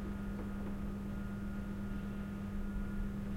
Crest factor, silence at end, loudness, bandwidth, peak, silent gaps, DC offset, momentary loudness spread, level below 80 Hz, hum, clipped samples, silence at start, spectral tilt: 12 dB; 0 s; -42 LUFS; 16 kHz; -28 dBFS; none; under 0.1%; 1 LU; -44 dBFS; none; under 0.1%; 0 s; -8 dB/octave